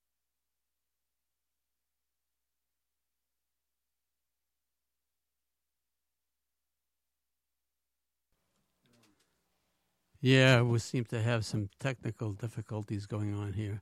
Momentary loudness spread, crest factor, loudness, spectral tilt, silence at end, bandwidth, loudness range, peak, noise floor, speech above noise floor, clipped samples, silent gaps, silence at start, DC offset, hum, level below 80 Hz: 15 LU; 28 dB; -31 LUFS; -6 dB/octave; 0 s; 12 kHz; 5 LU; -10 dBFS; -90 dBFS; 59 dB; under 0.1%; none; 10.2 s; under 0.1%; 60 Hz at -65 dBFS; -70 dBFS